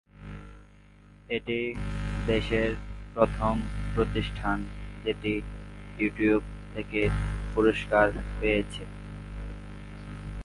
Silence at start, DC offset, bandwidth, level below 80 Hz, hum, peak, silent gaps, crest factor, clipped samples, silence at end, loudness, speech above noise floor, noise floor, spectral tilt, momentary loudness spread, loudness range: 0.2 s; under 0.1%; 11.5 kHz; -38 dBFS; 50 Hz at -40 dBFS; -6 dBFS; none; 24 dB; under 0.1%; 0 s; -29 LUFS; 27 dB; -54 dBFS; -7 dB/octave; 17 LU; 3 LU